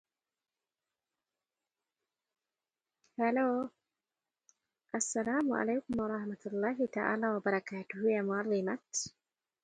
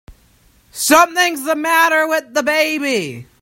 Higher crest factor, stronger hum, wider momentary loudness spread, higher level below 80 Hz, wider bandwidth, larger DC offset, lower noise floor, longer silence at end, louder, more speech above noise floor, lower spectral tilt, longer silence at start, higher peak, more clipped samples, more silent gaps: first, 22 dB vs 16 dB; neither; about the same, 8 LU vs 9 LU; second, -74 dBFS vs -54 dBFS; second, 9.4 kHz vs 16.5 kHz; neither; first, under -90 dBFS vs -53 dBFS; first, 0.55 s vs 0.2 s; second, -34 LUFS vs -14 LUFS; first, over 57 dB vs 37 dB; first, -4.5 dB/octave vs -2 dB/octave; first, 3.2 s vs 0.1 s; second, -14 dBFS vs 0 dBFS; neither; neither